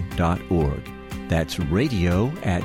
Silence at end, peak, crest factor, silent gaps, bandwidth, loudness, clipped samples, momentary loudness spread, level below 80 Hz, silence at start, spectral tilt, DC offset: 0 s; -10 dBFS; 14 dB; none; 16 kHz; -23 LUFS; under 0.1%; 11 LU; -34 dBFS; 0 s; -7 dB/octave; under 0.1%